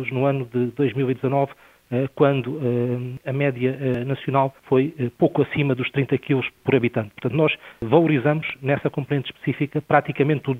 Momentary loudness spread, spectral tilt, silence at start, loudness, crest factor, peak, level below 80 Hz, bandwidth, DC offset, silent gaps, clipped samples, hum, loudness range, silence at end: 6 LU; -9 dB/octave; 0 s; -22 LUFS; 20 dB; 0 dBFS; -58 dBFS; 4.2 kHz; under 0.1%; none; under 0.1%; none; 2 LU; 0 s